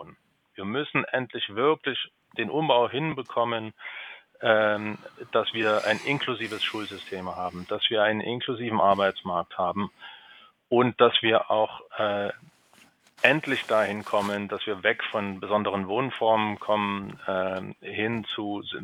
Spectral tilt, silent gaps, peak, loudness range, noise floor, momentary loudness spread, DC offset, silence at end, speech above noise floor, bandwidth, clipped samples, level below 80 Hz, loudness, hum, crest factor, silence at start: -5.5 dB/octave; none; -2 dBFS; 3 LU; -59 dBFS; 12 LU; under 0.1%; 0 s; 33 dB; 15.5 kHz; under 0.1%; -70 dBFS; -26 LUFS; none; 24 dB; 0 s